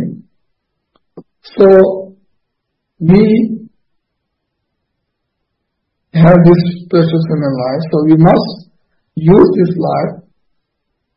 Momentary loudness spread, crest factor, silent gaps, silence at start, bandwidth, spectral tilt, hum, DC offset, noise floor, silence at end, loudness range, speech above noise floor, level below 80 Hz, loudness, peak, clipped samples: 17 LU; 12 dB; none; 0 s; 5.6 kHz; -11 dB/octave; none; under 0.1%; -72 dBFS; 0.95 s; 6 LU; 63 dB; -44 dBFS; -10 LUFS; 0 dBFS; 0.3%